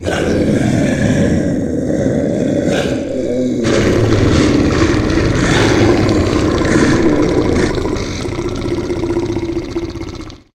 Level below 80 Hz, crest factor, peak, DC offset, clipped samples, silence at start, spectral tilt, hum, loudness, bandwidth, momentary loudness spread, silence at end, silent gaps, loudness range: -26 dBFS; 14 dB; 0 dBFS; under 0.1%; under 0.1%; 0 s; -6 dB/octave; none; -14 LUFS; 13 kHz; 9 LU; 0.2 s; none; 3 LU